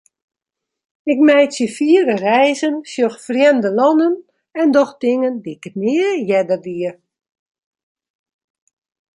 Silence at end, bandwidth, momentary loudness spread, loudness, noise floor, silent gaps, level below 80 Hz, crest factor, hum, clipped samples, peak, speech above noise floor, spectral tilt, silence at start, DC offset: 2.25 s; 11.5 kHz; 11 LU; -16 LUFS; -82 dBFS; none; -70 dBFS; 16 dB; none; under 0.1%; -2 dBFS; 67 dB; -5 dB/octave; 1.05 s; under 0.1%